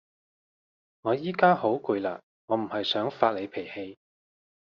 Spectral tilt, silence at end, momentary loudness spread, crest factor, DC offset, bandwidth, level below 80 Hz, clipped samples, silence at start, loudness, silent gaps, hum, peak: -3 dB/octave; 0.8 s; 16 LU; 24 dB; under 0.1%; 6.8 kHz; -74 dBFS; under 0.1%; 1.05 s; -27 LUFS; 2.23-2.48 s; none; -6 dBFS